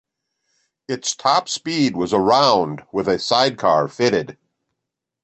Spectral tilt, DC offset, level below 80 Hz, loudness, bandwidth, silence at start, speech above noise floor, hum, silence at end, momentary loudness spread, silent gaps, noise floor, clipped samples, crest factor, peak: -4 dB/octave; under 0.1%; -58 dBFS; -18 LUFS; 8.8 kHz; 0.9 s; 63 dB; none; 0.9 s; 10 LU; none; -82 dBFS; under 0.1%; 18 dB; -2 dBFS